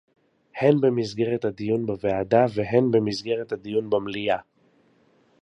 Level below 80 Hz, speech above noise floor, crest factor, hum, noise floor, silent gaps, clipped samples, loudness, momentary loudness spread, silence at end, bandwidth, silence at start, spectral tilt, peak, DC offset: -58 dBFS; 39 dB; 20 dB; none; -61 dBFS; none; under 0.1%; -24 LUFS; 7 LU; 1 s; 10 kHz; 0.55 s; -7 dB/octave; -4 dBFS; under 0.1%